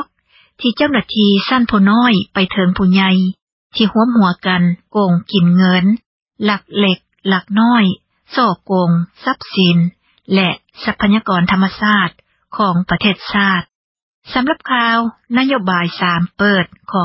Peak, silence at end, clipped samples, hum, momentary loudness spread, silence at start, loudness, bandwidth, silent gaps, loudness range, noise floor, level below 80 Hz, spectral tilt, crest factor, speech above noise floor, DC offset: 0 dBFS; 0 s; under 0.1%; none; 8 LU; 0 s; -14 LUFS; 5.8 kHz; 3.42-3.70 s, 6.06-6.26 s, 13.75-13.95 s, 14.02-14.22 s; 3 LU; -54 dBFS; -46 dBFS; -9.5 dB/octave; 14 dB; 40 dB; under 0.1%